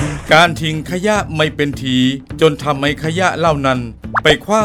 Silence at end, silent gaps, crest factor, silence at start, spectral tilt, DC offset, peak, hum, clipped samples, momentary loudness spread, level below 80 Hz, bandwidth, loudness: 0 s; none; 14 dB; 0 s; -5 dB/octave; under 0.1%; 0 dBFS; none; 0.1%; 8 LU; -36 dBFS; 16.5 kHz; -15 LUFS